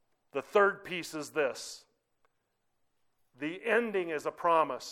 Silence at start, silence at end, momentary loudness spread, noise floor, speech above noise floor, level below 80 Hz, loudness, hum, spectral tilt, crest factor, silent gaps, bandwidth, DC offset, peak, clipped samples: 0.35 s; 0 s; 13 LU; -78 dBFS; 47 dB; -78 dBFS; -31 LUFS; none; -3.5 dB/octave; 20 dB; none; 16.5 kHz; under 0.1%; -14 dBFS; under 0.1%